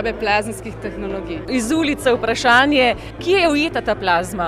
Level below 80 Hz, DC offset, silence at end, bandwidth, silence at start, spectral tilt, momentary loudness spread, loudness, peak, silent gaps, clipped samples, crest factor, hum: -40 dBFS; under 0.1%; 0 s; 15.5 kHz; 0 s; -4 dB/octave; 14 LU; -17 LUFS; -2 dBFS; none; under 0.1%; 16 dB; none